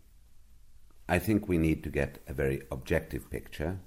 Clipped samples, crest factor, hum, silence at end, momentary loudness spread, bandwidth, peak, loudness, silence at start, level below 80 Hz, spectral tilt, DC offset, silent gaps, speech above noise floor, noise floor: under 0.1%; 20 dB; none; 0 s; 11 LU; 16 kHz; -12 dBFS; -32 LUFS; 0.15 s; -44 dBFS; -7 dB/octave; under 0.1%; none; 23 dB; -54 dBFS